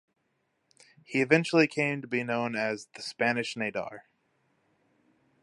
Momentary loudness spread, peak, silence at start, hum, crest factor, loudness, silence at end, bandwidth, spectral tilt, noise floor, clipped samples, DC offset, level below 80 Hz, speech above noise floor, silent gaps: 13 LU; -6 dBFS; 1.1 s; none; 24 dB; -28 LUFS; 1.45 s; 11.5 kHz; -5.5 dB/octave; -76 dBFS; under 0.1%; under 0.1%; -76 dBFS; 47 dB; none